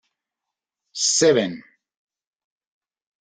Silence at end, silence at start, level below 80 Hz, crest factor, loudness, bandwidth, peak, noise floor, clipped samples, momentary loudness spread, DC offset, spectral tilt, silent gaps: 1.6 s; 0.95 s; -66 dBFS; 20 dB; -19 LUFS; 10 kHz; -6 dBFS; -86 dBFS; under 0.1%; 20 LU; under 0.1%; -2.5 dB/octave; none